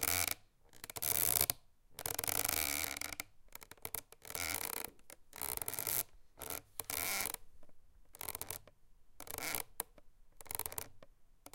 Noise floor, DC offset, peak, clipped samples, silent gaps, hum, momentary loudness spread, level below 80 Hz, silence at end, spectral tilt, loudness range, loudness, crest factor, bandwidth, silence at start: -61 dBFS; under 0.1%; -10 dBFS; under 0.1%; none; none; 17 LU; -62 dBFS; 0.05 s; -0.5 dB/octave; 8 LU; -38 LUFS; 32 dB; 17 kHz; 0 s